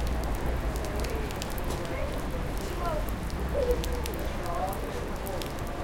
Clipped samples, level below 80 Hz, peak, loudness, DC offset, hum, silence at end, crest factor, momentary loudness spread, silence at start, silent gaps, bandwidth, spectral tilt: under 0.1%; -34 dBFS; -14 dBFS; -33 LUFS; under 0.1%; none; 0 s; 18 dB; 4 LU; 0 s; none; 17 kHz; -5.5 dB/octave